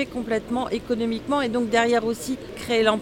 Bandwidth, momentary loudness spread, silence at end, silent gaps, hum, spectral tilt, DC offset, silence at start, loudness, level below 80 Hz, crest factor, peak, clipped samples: 17 kHz; 8 LU; 0 s; none; none; -4.5 dB/octave; under 0.1%; 0 s; -24 LUFS; -50 dBFS; 20 dB; -4 dBFS; under 0.1%